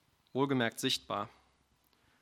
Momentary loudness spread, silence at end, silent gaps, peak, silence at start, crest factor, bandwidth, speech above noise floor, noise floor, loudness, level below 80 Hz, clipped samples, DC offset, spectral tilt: 9 LU; 0.95 s; none; -16 dBFS; 0.35 s; 22 dB; 17 kHz; 38 dB; -72 dBFS; -34 LUFS; -74 dBFS; under 0.1%; under 0.1%; -4 dB/octave